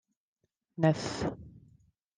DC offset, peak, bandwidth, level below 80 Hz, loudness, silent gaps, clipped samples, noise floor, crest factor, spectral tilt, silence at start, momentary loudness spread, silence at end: under 0.1%; -12 dBFS; 9.6 kHz; -60 dBFS; -31 LUFS; none; under 0.1%; -65 dBFS; 22 dB; -6.5 dB/octave; 0.8 s; 21 LU; 0.6 s